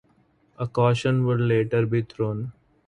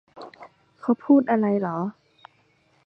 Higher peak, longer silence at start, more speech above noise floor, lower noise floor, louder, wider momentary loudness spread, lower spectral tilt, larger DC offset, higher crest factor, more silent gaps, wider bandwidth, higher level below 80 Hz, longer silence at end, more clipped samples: about the same, -6 dBFS vs -6 dBFS; first, 0.6 s vs 0.15 s; about the same, 40 dB vs 42 dB; about the same, -62 dBFS vs -63 dBFS; about the same, -24 LUFS vs -23 LUFS; second, 11 LU vs 24 LU; second, -8 dB/octave vs -10 dB/octave; neither; about the same, 18 dB vs 18 dB; neither; first, 9.8 kHz vs 4.8 kHz; first, -56 dBFS vs -70 dBFS; second, 0.35 s vs 0.95 s; neither